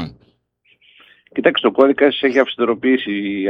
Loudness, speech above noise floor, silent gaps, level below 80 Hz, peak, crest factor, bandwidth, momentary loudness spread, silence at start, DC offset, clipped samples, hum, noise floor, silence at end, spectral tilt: -16 LUFS; 44 dB; none; -58 dBFS; 0 dBFS; 18 dB; 6.6 kHz; 8 LU; 0 s; under 0.1%; under 0.1%; none; -60 dBFS; 0 s; -6 dB/octave